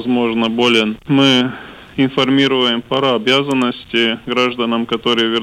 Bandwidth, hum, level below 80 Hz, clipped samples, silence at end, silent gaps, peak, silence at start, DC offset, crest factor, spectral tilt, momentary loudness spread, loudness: 11.5 kHz; none; -52 dBFS; under 0.1%; 0 s; none; -4 dBFS; 0 s; under 0.1%; 12 dB; -5 dB/octave; 5 LU; -15 LUFS